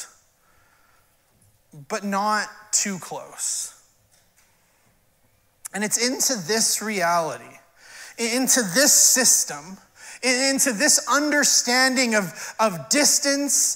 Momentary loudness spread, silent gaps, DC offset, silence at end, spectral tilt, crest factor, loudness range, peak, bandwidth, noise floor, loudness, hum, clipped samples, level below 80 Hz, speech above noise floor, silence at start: 16 LU; none; under 0.1%; 0 s; -1 dB/octave; 20 dB; 10 LU; -2 dBFS; 16.5 kHz; -62 dBFS; -19 LUFS; none; under 0.1%; -70 dBFS; 41 dB; 0 s